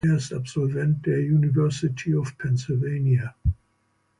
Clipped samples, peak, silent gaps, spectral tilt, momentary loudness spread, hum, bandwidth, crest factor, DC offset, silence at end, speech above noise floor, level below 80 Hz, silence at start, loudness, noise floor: under 0.1%; -12 dBFS; none; -7.5 dB/octave; 7 LU; none; 11 kHz; 12 dB; under 0.1%; 0.65 s; 46 dB; -40 dBFS; 0.05 s; -24 LUFS; -69 dBFS